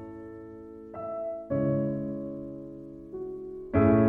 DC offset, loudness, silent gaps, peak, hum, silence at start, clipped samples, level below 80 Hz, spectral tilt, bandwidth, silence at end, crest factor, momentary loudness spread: under 0.1%; -31 LUFS; none; -10 dBFS; none; 0 s; under 0.1%; -52 dBFS; -12 dB/octave; 3.6 kHz; 0 s; 18 dB; 17 LU